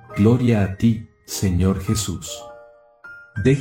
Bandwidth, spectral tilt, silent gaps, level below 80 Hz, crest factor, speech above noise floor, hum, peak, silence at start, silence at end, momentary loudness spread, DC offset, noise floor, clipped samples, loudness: 16.5 kHz; -6 dB/octave; none; -40 dBFS; 18 dB; 28 dB; none; -2 dBFS; 0.1 s; 0 s; 18 LU; under 0.1%; -47 dBFS; under 0.1%; -20 LUFS